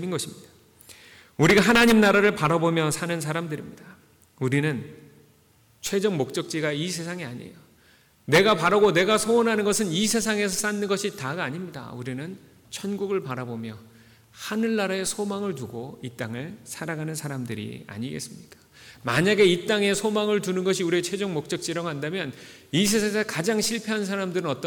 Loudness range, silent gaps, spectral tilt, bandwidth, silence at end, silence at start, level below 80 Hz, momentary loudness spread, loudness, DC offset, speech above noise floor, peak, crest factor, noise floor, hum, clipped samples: 10 LU; none; -4.5 dB/octave; 19 kHz; 0 s; 0 s; -58 dBFS; 17 LU; -24 LUFS; under 0.1%; 35 dB; -8 dBFS; 16 dB; -59 dBFS; none; under 0.1%